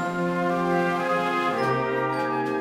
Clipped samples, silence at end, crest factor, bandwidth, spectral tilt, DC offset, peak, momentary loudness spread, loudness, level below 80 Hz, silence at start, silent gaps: under 0.1%; 0 s; 14 dB; 16 kHz; -6.5 dB/octave; under 0.1%; -12 dBFS; 2 LU; -24 LUFS; -62 dBFS; 0 s; none